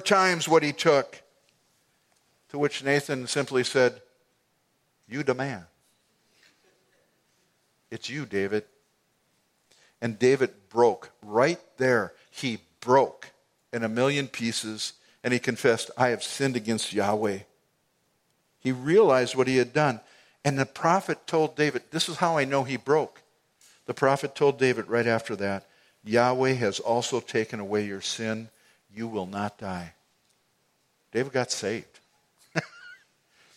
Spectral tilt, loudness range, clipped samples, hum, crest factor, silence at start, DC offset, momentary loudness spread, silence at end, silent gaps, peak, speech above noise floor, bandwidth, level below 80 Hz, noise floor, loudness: -4.5 dB/octave; 11 LU; under 0.1%; none; 22 dB; 0 s; under 0.1%; 14 LU; 0.6 s; none; -4 dBFS; 46 dB; 15 kHz; -72 dBFS; -71 dBFS; -26 LUFS